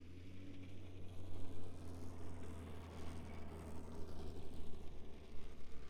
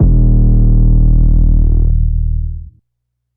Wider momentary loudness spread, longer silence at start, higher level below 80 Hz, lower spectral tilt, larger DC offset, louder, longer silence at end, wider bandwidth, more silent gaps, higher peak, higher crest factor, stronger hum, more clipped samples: second, 5 LU vs 9 LU; about the same, 0 s vs 0 s; second, -56 dBFS vs -10 dBFS; second, -6.5 dB/octave vs -17.5 dB/octave; neither; second, -54 LUFS vs -13 LUFS; second, 0 s vs 0.7 s; first, 11.5 kHz vs 1.1 kHz; neither; second, -28 dBFS vs 0 dBFS; about the same, 12 dB vs 10 dB; neither; neither